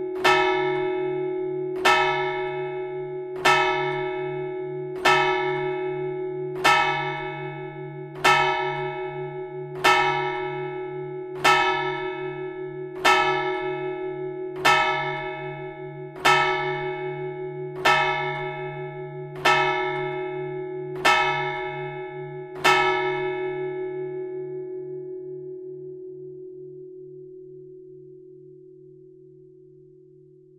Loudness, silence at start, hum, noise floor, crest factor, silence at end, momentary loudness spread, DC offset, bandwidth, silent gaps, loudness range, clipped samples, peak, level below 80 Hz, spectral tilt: -24 LUFS; 0 s; none; -51 dBFS; 22 dB; 1.15 s; 17 LU; under 0.1%; 14 kHz; none; 12 LU; under 0.1%; -4 dBFS; -58 dBFS; -4 dB/octave